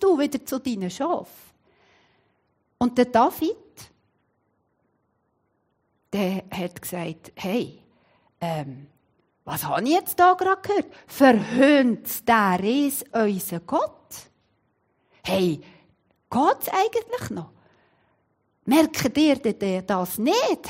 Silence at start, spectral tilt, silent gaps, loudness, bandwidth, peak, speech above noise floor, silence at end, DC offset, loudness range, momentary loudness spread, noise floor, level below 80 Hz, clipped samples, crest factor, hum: 0 s; -5 dB/octave; none; -23 LUFS; 16 kHz; -4 dBFS; 49 dB; 0 s; under 0.1%; 11 LU; 15 LU; -71 dBFS; -62 dBFS; under 0.1%; 20 dB; none